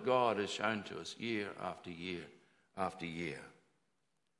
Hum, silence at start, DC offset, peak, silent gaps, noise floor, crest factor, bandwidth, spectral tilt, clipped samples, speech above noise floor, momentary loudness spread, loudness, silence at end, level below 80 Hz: none; 0 s; under 0.1%; -18 dBFS; none; -84 dBFS; 22 dB; 11.5 kHz; -4.5 dB/octave; under 0.1%; 46 dB; 15 LU; -39 LUFS; 0.9 s; -80 dBFS